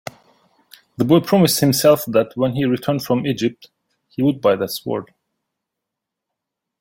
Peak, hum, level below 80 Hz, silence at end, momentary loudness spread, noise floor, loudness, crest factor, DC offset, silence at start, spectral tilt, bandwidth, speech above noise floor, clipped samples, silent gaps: -2 dBFS; none; -58 dBFS; 1.75 s; 11 LU; -82 dBFS; -18 LUFS; 18 dB; under 0.1%; 1 s; -5.5 dB/octave; 17 kHz; 65 dB; under 0.1%; none